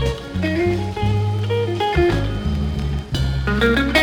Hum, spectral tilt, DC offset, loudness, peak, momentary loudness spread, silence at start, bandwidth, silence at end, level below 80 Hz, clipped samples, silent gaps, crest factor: none; -6.5 dB/octave; under 0.1%; -20 LUFS; -2 dBFS; 6 LU; 0 s; 16.5 kHz; 0 s; -28 dBFS; under 0.1%; none; 16 dB